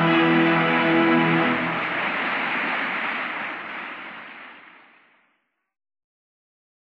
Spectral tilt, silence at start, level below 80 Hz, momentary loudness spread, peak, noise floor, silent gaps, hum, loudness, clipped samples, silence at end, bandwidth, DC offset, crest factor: -7.5 dB/octave; 0 s; -66 dBFS; 18 LU; -8 dBFS; -71 dBFS; none; none; -21 LUFS; under 0.1%; 2.25 s; 5.6 kHz; under 0.1%; 16 dB